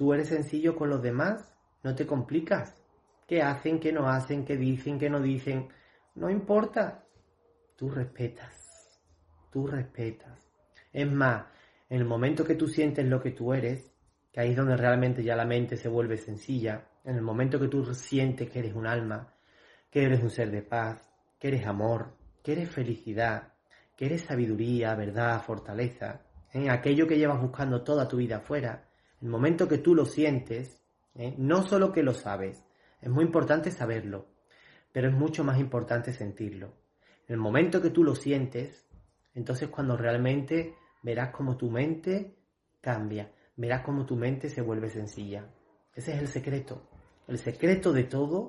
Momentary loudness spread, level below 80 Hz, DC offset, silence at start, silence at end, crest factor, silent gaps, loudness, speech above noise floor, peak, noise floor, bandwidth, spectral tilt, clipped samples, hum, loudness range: 14 LU; -62 dBFS; under 0.1%; 0 s; 0 s; 20 dB; none; -30 LUFS; 38 dB; -10 dBFS; -67 dBFS; 11.5 kHz; -7.5 dB/octave; under 0.1%; none; 6 LU